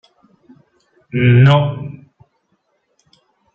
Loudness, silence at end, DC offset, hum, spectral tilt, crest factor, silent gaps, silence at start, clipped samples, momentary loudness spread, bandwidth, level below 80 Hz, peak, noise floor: -13 LUFS; 1.6 s; under 0.1%; none; -8.5 dB/octave; 16 dB; none; 1.15 s; under 0.1%; 19 LU; 4.3 kHz; -52 dBFS; -2 dBFS; -65 dBFS